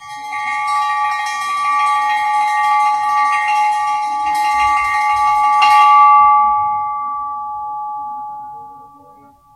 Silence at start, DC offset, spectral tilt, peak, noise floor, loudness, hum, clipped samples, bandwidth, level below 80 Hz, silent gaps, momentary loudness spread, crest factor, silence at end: 0 s; under 0.1%; 0 dB/octave; 0 dBFS; -45 dBFS; -14 LUFS; none; under 0.1%; 13 kHz; -52 dBFS; none; 16 LU; 16 dB; 0.7 s